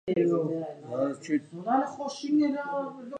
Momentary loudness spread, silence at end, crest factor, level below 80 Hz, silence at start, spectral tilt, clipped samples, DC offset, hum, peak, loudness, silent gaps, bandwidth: 9 LU; 0 s; 16 dB; -74 dBFS; 0.05 s; -6.5 dB/octave; under 0.1%; under 0.1%; none; -14 dBFS; -29 LUFS; none; 9.2 kHz